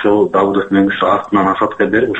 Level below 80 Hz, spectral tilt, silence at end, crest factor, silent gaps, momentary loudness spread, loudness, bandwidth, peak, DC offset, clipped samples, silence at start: -48 dBFS; -7.5 dB/octave; 0 s; 12 dB; none; 2 LU; -13 LUFS; 8 kHz; 0 dBFS; under 0.1%; under 0.1%; 0 s